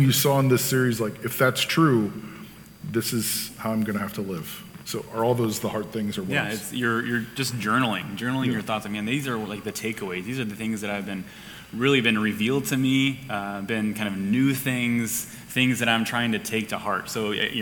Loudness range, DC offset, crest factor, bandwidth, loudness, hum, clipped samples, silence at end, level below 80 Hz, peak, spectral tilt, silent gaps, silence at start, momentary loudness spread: 4 LU; under 0.1%; 20 dB; 19 kHz; -25 LUFS; none; under 0.1%; 0 s; -60 dBFS; -6 dBFS; -4.5 dB/octave; none; 0 s; 11 LU